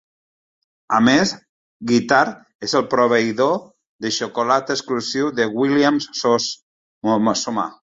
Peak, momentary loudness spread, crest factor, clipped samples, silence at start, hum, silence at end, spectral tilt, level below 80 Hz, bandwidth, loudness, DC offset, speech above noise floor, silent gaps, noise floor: 0 dBFS; 10 LU; 18 dB; under 0.1%; 0.9 s; none; 0.2 s; -4 dB/octave; -60 dBFS; 7.8 kHz; -19 LUFS; under 0.1%; over 72 dB; 1.49-1.80 s, 2.55-2.59 s, 3.87-3.99 s, 6.62-7.01 s; under -90 dBFS